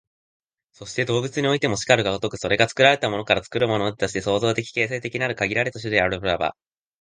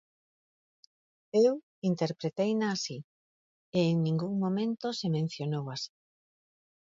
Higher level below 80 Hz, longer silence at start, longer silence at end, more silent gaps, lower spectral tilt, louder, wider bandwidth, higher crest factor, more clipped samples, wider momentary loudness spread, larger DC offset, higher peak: first, -52 dBFS vs -76 dBFS; second, 0.8 s vs 1.35 s; second, 0.5 s vs 0.95 s; second, none vs 1.63-1.82 s, 3.04-3.72 s; second, -4.5 dB/octave vs -6.5 dB/octave; first, -22 LUFS vs -31 LUFS; first, 10 kHz vs 7.8 kHz; about the same, 22 dB vs 18 dB; neither; about the same, 8 LU vs 10 LU; neither; first, 0 dBFS vs -14 dBFS